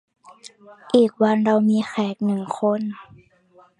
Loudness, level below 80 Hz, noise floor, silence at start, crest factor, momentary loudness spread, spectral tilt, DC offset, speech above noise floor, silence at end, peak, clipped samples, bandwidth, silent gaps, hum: -20 LUFS; -68 dBFS; -55 dBFS; 0.45 s; 18 dB; 9 LU; -7 dB/octave; under 0.1%; 34 dB; 0.75 s; -4 dBFS; under 0.1%; 10.5 kHz; none; none